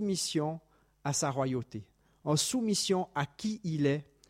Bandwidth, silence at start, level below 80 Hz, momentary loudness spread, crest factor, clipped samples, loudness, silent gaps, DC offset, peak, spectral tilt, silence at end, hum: 16.5 kHz; 0 s; -68 dBFS; 11 LU; 16 dB; under 0.1%; -32 LUFS; none; under 0.1%; -16 dBFS; -4.5 dB/octave; 0.25 s; none